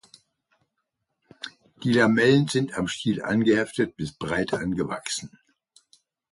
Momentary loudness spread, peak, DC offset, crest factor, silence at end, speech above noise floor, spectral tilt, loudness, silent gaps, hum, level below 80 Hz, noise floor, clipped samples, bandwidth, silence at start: 20 LU; -8 dBFS; under 0.1%; 18 dB; 1.05 s; 56 dB; -5.5 dB/octave; -24 LUFS; none; none; -56 dBFS; -79 dBFS; under 0.1%; 11.5 kHz; 1.4 s